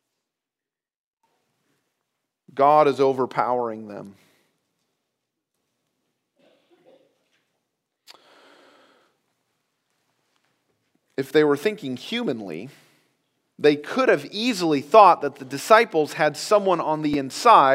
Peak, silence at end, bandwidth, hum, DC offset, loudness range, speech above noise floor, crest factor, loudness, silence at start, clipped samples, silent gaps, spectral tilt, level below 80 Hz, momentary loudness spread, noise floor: 0 dBFS; 0 s; 16 kHz; none; under 0.1%; 9 LU; 70 dB; 24 dB; -20 LUFS; 2.55 s; under 0.1%; none; -4.5 dB/octave; -70 dBFS; 17 LU; -90 dBFS